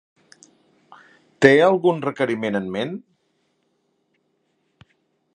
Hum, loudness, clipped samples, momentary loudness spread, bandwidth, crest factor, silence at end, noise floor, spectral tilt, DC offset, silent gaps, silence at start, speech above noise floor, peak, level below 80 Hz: none; -19 LUFS; under 0.1%; 14 LU; 10.5 kHz; 24 dB; 2.35 s; -69 dBFS; -6 dB/octave; under 0.1%; none; 1.4 s; 51 dB; 0 dBFS; -64 dBFS